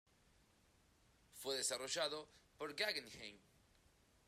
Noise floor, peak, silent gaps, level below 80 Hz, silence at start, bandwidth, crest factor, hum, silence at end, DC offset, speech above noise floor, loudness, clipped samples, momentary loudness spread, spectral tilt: -74 dBFS; -26 dBFS; none; -78 dBFS; 1.35 s; 15 kHz; 22 dB; none; 0.9 s; under 0.1%; 29 dB; -43 LUFS; under 0.1%; 15 LU; -0.5 dB/octave